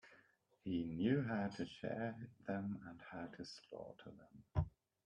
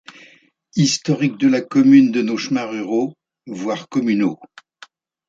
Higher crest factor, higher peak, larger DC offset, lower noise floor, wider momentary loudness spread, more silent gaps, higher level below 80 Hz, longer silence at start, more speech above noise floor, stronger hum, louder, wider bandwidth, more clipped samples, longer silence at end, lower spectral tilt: about the same, 20 dB vs 16 dB; second, -24 dBFS vs -2 dBFS; neither; first, -74 dBFS vs -52 dBFS; about the same, 16 LU vs 15 LU; neither; about the same, -62 dBFS vs -64 dBFS; second, 0.05 s vs 0.75 s; second, 30 dB vs 35 dB; neither; second, -44 LUFS vs -18 LUFS; first, 10 kHz vs 7.8 kHz; neither; second, 0.35 s vs 0.85 s; first, -7.5 dB/octave vs -5.5 dB/octave